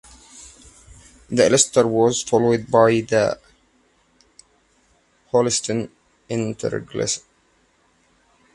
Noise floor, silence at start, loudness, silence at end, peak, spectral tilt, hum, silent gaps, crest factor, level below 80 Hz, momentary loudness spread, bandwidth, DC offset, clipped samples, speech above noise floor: -61 dBFS; 0.35 s; -19 LUFS; 1.35 s; 0 dBFS; -4 dB/octave; none; none; 22 dB; -56 dBFS; 15 LU; 11.5 kHz; under 0.1%; under 0.1%; 43 dB